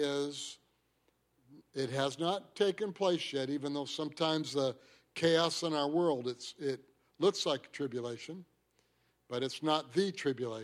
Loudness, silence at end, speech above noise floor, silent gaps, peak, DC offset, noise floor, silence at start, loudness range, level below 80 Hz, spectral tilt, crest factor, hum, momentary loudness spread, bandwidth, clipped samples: -34 LUFS; 0 s; 41 dB; none; -16 dBFS; under 0.1%; -76 dBFS; 0 s; 4 LU; -80 dBFS; -4.5 dB/octave; 20 dB; none; 13 LU; 14 kHz; under 0.1%